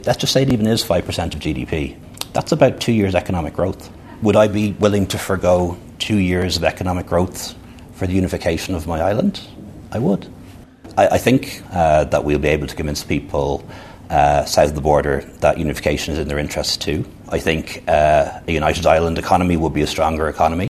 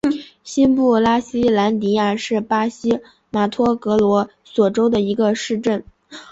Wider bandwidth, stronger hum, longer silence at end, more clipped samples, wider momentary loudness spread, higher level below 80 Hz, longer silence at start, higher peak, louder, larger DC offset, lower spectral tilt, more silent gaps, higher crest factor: first, 14 kHz vs 8 kHz; neither; about the same, 0 s vs 0.1 s; neither; about the same, 10 LU vs 8 LU; first, -34 dBFS vs -52 dBFS; about the same, 0 s vs 0.05 s; first, 0 dBFS vs -4 dBFS; about the same, -18 LUFS vs -18 LUFS; neither; about the same, -5.5 dB/octave vs -6 dB/octave; neither; about the same, 18 dB vs 14 dB